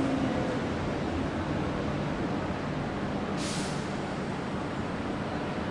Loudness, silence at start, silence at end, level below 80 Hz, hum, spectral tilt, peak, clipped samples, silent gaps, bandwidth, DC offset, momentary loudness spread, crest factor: -32 LUFS; 0 s; 0 s; -48 dBFS; none; -6 dB/octave; -16 dBFS; under 0.1%; none; 11.5 kHz; under 0.1%; 3 LU; 14 dB